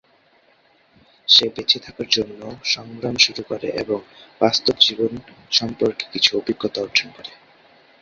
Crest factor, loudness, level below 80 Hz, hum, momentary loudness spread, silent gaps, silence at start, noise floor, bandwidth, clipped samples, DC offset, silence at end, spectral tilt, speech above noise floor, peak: 22 dB; -19 LUFS; -58 dBFS; none; 15 LU; none; 1.3 s; -58 dBFS; 7.8 kHz; under 0.1%; under 0.1%; 0.7 s; -2.5 dB/octave; 36 dB; 0 dBFS